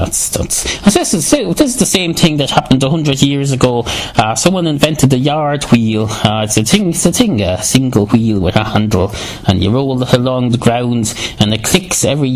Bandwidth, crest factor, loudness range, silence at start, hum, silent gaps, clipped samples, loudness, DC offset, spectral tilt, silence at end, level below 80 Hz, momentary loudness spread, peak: 16 kHz; 12 dB; 1 LU; 0 s; none; none; 0.3%; -12 LUFS; under 0.1%; -4.5 dB/octave; 0 s; -32 dBFS; 4 LU; 0 dBFS